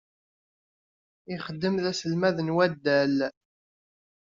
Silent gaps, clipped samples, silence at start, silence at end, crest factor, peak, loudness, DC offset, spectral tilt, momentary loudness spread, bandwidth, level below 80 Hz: none; under 0.1%; 1.3 s; 0.9 s; 20 dB; -10 dBFS; -26 LUFS; under 0.1%; -4.5 dB/octave; 12 LU; 7.6 kHz; -68 dBFS